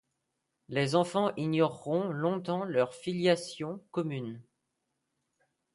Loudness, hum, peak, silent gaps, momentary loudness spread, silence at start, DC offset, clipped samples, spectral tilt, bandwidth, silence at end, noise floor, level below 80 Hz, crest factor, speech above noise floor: -31 LUFS; none; -12 dBFS; none; 10 LU; 0.7 s; under 0.1%; under 0.1%; -6 dB/octave; 11.5 kHz; 1.3 s; -82 dBFS; -76 dBFS; 20 dB; 52 dB